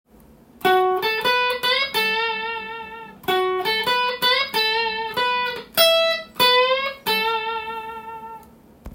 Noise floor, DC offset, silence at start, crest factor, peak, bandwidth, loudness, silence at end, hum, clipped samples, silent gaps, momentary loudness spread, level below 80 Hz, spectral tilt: -50 dBFS; under 0.1%; 0.6 s; 20 dB; -2 dBFS; 17 kHz; -20 LUFS; 0 s; none; under 0.1%; none; 16 LU; -54 dBFS; -2 dB/octave